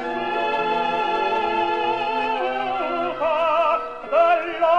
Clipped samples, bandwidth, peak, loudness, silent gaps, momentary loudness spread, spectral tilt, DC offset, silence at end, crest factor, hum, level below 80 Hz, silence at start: under 0.1%; 8.2 kHz; -8 dBFS; -21 LUFS; none; 5 LU; -4.5 dB/octave; 0.4%; 0 s; 14 dB; none; -58 dBFS; 0 s